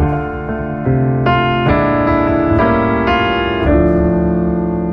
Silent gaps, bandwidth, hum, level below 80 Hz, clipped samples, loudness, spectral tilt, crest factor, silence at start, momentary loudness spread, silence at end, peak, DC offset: none; 6 kHz; none; -26 dBFS; under 0.1%; -14 LUFS; -9.5 dB/octave; 12 dB; 0 s; 6 LU; 0 s; -2 dBFS; under 0.1%